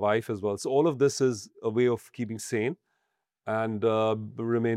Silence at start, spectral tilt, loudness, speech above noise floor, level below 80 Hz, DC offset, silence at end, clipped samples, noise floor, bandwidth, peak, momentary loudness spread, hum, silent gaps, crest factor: 0 s; -6 dB/octave; -28 LUFS; 53 dB; -74 dBFS; under 0.1%; 0 s; under 0.1%; -80 dBFS; 15 kHz; -10 dBFS; 9 LU; none; none; 16 dB